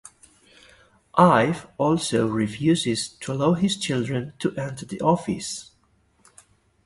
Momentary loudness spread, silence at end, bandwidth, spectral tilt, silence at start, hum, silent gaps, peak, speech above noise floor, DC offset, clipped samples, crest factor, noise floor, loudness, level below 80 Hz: 12 LU; 1.25 s; 11.5 kHz; -5.5 dB/octave; 1.15 s; none; none; -2 dBFS; 41 dB; under 0.1%; under 0.1%; 22 dB; -63 dBFS; -23 LUFS; -56 dBFS